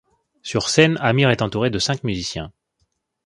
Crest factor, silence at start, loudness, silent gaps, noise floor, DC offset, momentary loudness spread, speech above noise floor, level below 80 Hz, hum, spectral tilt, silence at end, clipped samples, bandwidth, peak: 20 dB; 0.45 s; -19 LUFS; none; -70 dBFS; under 0.1%; 15 LU; 51 dB; -48 dBFS; none; -4.5 dB/octave; 0.75 s; under 0.1%; 11.5 kHz; 0 dBFS